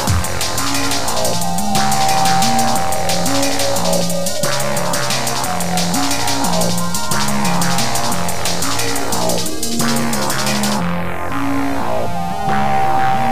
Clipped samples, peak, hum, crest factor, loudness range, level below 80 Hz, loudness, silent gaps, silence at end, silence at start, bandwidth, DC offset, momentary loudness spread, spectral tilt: under 0.1%; 0 dBFS; none; 16 dB; 2 LU; -36 dBFS; -17 LUFS; none; 0 s; 0 s; 16 kHz; 10%; 5 LU; -3.5 dB/octave